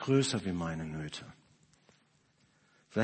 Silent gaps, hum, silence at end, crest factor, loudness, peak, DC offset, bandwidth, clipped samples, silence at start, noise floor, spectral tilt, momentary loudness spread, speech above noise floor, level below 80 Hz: none; none; 0 s; 20 dB; -35 LUFS; -14 dBFS; under 0.1%; 8.8 kHz; under 0.1%; 0 s; -70 dBFS; -5.5 dB/octave; 16 LU; 37 dB; -62 dBFS